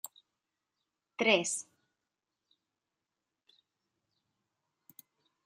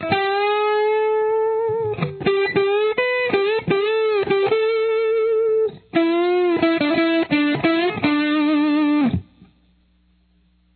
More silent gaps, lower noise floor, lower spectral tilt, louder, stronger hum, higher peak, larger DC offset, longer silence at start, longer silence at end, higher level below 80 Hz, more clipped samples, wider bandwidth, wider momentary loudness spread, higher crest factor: neither; first, -89 dBFS vs -59 dBFS; second, -2 dB/octave vs -9.5 dB/octave; second, -30 LUFS vs -19 LUFS; neither; second, -10 dBFS vs -6 dBFS; neither; first, 1.2 s vs 0 s; first, 3.85 s vs 1.55 s; second, under -90 dBFS vs -54 dBFS; neither; first, 15 kHz vs 4.6 kHz; first, 22 LU vs 3 LU; first, 30 dB vs 14 dB